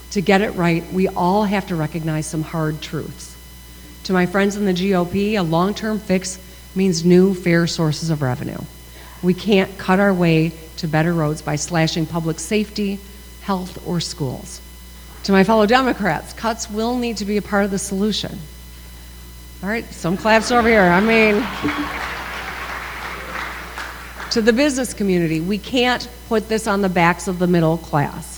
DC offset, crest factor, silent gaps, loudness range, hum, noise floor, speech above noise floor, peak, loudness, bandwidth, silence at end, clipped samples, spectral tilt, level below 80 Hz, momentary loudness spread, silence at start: under 0.1%; 20 dB; none; 6 LU; none; -39 dBFS; 21 dB; 0 dBFS; -19 LUFS; over 20 kHz; 0 s; under 0.1%; -5.5 dB/octave; -40 dBFS; 18 LU; 0 s